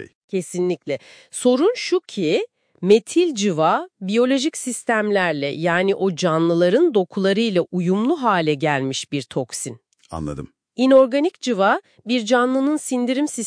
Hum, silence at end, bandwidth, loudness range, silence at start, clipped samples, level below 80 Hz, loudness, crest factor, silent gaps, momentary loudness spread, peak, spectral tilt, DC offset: none; 0 s; 10.5 kHz; 2 LU; 0 s; under 0.1%; -56 dBFS; -20 LUFS; 16 dB; 0.15-0.28 s; 12 LU; -4 dBFS; -5 dB/octave; under 0.1%